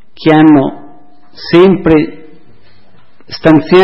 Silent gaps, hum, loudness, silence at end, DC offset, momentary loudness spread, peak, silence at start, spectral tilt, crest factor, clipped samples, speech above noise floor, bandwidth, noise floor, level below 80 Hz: none; none; -8 LUFS; 0 s; 3%; 15 LU; 0 dBFS; 0.2 s; -8.5 dB/octave; 10 dB; 1%; 41 dB; 5.8 kHz; -47 dBFS; -38 dBFS